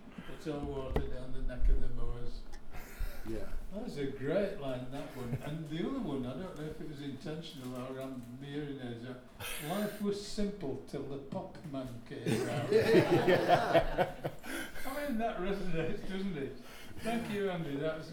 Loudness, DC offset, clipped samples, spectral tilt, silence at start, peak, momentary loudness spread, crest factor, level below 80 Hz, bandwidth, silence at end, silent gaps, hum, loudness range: -36 LUFS; under 0.1%; under 0.1%; -6 dB/octave; 0 s; -14 dBFS; 16 LU; 20 dB; -42 dBFS; 17 kHz; 0 s; none; none; 11 LU